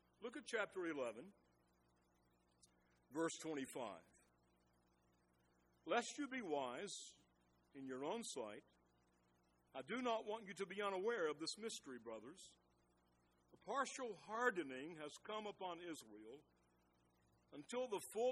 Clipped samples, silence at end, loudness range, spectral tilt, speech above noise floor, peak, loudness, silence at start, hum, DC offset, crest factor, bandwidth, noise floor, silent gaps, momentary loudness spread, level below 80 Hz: under 0.1%; 0 s; 5 LU; -3 dB/octave; 32 dB; -26 dBFS; -47 LUFS; 0.2 s; 60 Hz at -85 dBFS; under 0.1%; 24 dB; 11.5 kHz; -79 dBFS; none; 18 LU; -88 dBFS